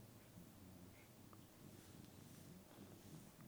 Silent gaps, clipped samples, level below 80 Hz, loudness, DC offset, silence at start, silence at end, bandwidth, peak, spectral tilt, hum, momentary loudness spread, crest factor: none; under 0.1%; -78 dBFS; -62 LUFS; under 0.1%; 0 s; 0 s; over 20 kHz; -46 dBFS; -5 dB/octave; none; 3 LU; 16 dB